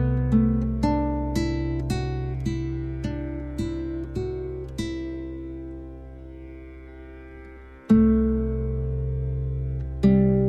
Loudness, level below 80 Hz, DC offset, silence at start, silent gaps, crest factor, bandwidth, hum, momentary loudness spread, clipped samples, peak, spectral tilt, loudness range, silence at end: -26 LUFS; -32 dBFS; under 0.1%; 0 s; none; 18 dB; 9.6 kHz; none; 22 LU; under 0.1%; -6 dBFS; -8.5 dB/octave; 10 LU; 0 s